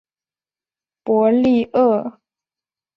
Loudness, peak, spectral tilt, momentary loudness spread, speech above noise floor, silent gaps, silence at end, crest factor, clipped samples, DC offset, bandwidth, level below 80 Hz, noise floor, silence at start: -17 LUFS; -4 dBFS; -8.5 dB/octave; 15 LU; over 74 dB; none; 0.85 s; 16 dB; under 0.1%; under 0.1%; 5.8 kHz; -58 dBFS; under -90 dBFS; 1.05 s